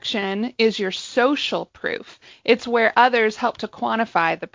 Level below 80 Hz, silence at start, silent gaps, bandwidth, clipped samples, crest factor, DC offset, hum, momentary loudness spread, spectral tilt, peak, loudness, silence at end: -64 dBFS; 0.05 s; none; 7.6 kHz; under 0.1%; 18 dB; under 0.1%; none; 12 LU; -4 dB/octave; -2 dBFS; -21 LUFS; 0.05 s